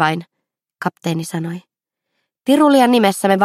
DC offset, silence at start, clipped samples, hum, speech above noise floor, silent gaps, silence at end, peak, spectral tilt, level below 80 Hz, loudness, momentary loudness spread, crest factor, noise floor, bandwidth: under 0.1%; 0 s; under 0.1%; none; 63 dB; none; 0 s; 0 dBFS; -5.5 dB/octave; -66 dBFS; -16 LUFS; 15 LU; 16 dB; -78 dBFS; 15.5 kHz